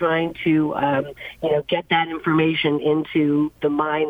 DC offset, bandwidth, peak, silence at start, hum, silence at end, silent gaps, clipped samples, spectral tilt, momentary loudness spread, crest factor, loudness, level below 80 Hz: under 0.1%; 4.8 kHz; -6 dBFS; 0 s; none; 0 s; none; under 0.1%; -8 dB/octave; 4 LU; 14 dB; -21 LUFS; -56 dBFS